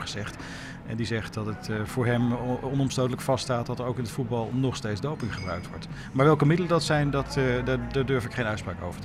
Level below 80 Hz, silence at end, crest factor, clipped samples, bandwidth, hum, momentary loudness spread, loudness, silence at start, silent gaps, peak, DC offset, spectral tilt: -46 dBFS; 0 s; 18 dB; under 0.1%; 14 kHz; none; 12 LU; -27 LUFS; 0 s; none; -10 dBFS; under 0.1%; -6 dB/octave